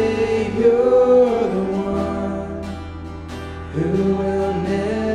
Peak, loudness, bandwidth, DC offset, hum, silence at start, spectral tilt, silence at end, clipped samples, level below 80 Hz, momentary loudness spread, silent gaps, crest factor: -4 dBFS; -19 LUFS; 10 kHz; under 0.1%; none; 0 s; -7.5 dB/octave; 0 s; under 0.1%; -40 dBFS; 17 LU; none; 14 dB